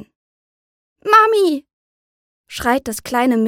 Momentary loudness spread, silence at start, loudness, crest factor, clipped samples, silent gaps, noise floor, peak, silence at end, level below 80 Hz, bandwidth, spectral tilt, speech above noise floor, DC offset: 16 LU; 1.05 s; -16 LUFS; 18 dB; under 0.1%; 1.73-2.44 s; under -90 dBFS; 0 dBFS; 0 s; -50 dBFS; 17 kHz; -4 dB/octave; over 73 dB; under 0.1%